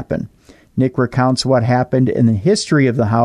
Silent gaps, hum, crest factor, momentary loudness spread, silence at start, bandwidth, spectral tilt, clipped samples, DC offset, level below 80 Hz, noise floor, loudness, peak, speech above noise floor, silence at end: none; none; 12 dB; 10 LU; 0 s; 11 kHz; -6.5 dB/octave; under 0.1%; under 0.1%; -46 dBFS; -47 dBFS; -15 LUFS; -4 dBFS; 33 dB; 0 s